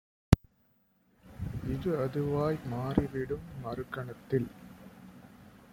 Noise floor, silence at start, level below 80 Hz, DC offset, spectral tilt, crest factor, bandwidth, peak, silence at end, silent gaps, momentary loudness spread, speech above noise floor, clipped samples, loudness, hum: -70 dBFS; 0.3 s; -46 dBFS; under 0.1%; -8 dB/octave; 30 dB; 16.5 kHz; -2 dBFS; 0.1 s; none; 23 LU; 37 dB; under 0.1%; -33 LUFS; none